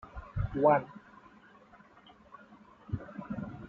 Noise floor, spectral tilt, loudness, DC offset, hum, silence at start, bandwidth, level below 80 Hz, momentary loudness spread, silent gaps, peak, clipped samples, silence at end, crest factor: -58 dBFS; -7.5 dB/octave; -32 LUFS; under 0.1%; none; 0.05 s; 4.7 kHz; -52 dBFS; 28 LU; none; -12 dBFS; under 0.1%; 0 s; 22 dB